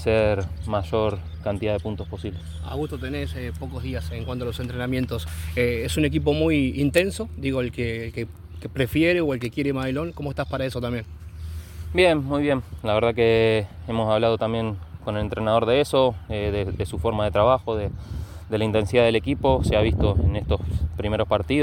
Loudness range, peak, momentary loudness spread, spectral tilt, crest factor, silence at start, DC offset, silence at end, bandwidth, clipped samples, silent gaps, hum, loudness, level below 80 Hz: 6 LU; -4 dBFS; 12 LU; -6.5 dB/octave; 18 dB; 0 s; under 0.1%; 0 s; 17 kHz; under 0.1%; none; none; -24 LUFS; -36 dBFS